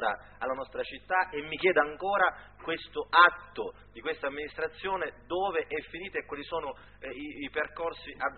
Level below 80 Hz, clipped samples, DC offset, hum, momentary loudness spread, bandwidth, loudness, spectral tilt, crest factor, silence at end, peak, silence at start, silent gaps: -60 dBFS; under 0.1%; under 0.1%; none; 14 LU; 4.5 kHz; -30 LUFS; -0.5 dB/octave; 26 dB; 0 s; -6 dBFS; 0 s; none